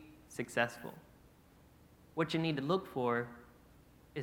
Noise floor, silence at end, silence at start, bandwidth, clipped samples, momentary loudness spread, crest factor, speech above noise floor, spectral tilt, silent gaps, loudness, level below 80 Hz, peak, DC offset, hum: -63 dBFS; 0 s; 0 s; 17 kHz; under 0.1%; 16 LU; 24 dB; 27 dB; -5.5 dB/octave; none; -37 LUFS; -68 dBFS; -16 dBFS; under 0.1%; none